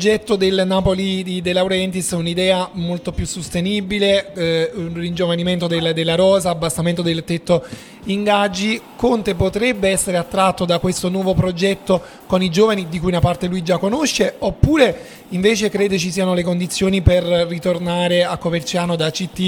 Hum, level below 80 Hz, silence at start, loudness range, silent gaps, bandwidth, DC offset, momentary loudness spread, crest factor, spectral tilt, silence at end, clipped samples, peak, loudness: none; -36 dBFS; 0 s; 2 LU; none; 18 kHz; under 0.1%; 6 LU; 18 dB; -5 dB/octave; 0 s; under 0.1%; 0 dBFS; -18 LUFS